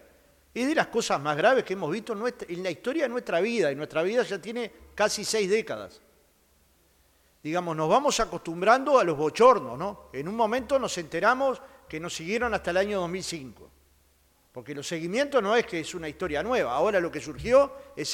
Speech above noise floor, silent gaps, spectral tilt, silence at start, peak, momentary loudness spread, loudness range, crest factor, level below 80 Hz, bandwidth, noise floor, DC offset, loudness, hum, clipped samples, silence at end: 38 dB; none; -4 dB/octave; 0.55 s; -6 dBFS; 13 LU; 7 LU; 22 dB; -56 dBFS; 16.5 kHz; -64 dBFS; under 0.1%; -26 LUFS; none; under 0.1%; 0 s